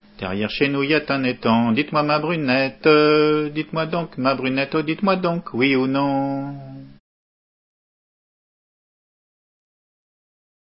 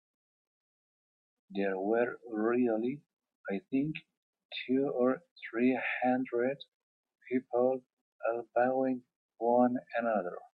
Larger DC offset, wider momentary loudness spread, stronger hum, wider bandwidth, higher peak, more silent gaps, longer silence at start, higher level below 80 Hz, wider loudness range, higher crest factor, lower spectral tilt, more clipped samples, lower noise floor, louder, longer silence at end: neither; about the same, 9 LU vs 11 LU; neither; first, 5.8 kHz vs 4.9 kHz; first, -2 dBFS vs -14 dBFS; second, none vs 3.35-3.44 s, 4.17-4.33 s, 4.45-4.49 s, 5.31-5.36 s, 6.68-7.03 s, 7.93-8.19 s, 9.16-9.29 s; second, 0.2 s vs 1.5 s; first, -56 dBFS vs -82 dBFS; first, 9 LU vs 2 LU; about the same, 20 dB vs 18 dB; first, -10.5 dB/octave vs -9 dB/octave; neither; about the same, under -90 dBFS vs under -90 dBFS; first, -20 LUFS vs -32 LUFS; first, 3.75 s vs 0.1 s